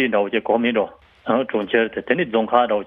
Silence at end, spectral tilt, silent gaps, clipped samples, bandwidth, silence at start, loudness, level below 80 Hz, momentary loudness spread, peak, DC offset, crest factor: 0 s; -8 dB/octave; none; under 0.1%; 4.1 kHz; 0 s; -20 LUFS; -58 dBFS; 5 LU; -2 dBFS; under 0.1%; 18 dB